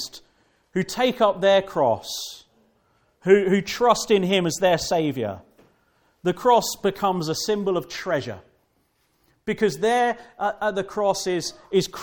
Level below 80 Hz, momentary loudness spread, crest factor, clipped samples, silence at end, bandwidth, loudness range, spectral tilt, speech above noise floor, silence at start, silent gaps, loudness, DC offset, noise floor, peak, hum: -58 dBFS; 12 LU; 20 dB; under 0.1%; 0 s; 18 kHz; 4 LU; -4.5 dB/octave; 45 dB; 0 s; none; -22 LUFS; under 0.1%; -67 dBFS; -4 dBFS; none